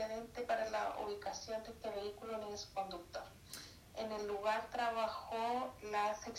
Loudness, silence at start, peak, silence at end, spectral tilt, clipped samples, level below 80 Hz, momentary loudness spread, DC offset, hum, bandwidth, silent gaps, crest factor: -42 LUFS; 0 s; -24 dBFS; 0 s; -3 dB/octave; under 0.1%; -66 dBFS; 12 LU; under 0.1%; none; 16 kHz; none; 18 dB